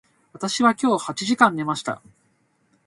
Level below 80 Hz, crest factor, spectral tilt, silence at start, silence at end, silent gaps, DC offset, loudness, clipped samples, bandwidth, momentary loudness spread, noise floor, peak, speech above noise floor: -66 dBFS; 22 dB; -4 dB/octave; 0.4 s; 0.9 s; none; under 0.1%; -21 LUFS; under 0.1%; 11.5 kHz; 13 LU; -65 dBFS; 0 dBFS; 44 dB